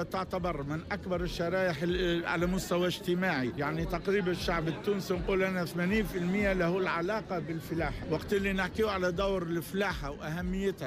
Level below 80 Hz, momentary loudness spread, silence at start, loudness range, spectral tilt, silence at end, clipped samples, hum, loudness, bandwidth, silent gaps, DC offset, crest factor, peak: -46 dBFS; 5 LU; 0 s; 1 LU; -6 dB/octave; 0 s; under 0.1%; none; -32 LUFS; 15.5 kHz; none; under 0.1%; 14 dB; -18 dBFS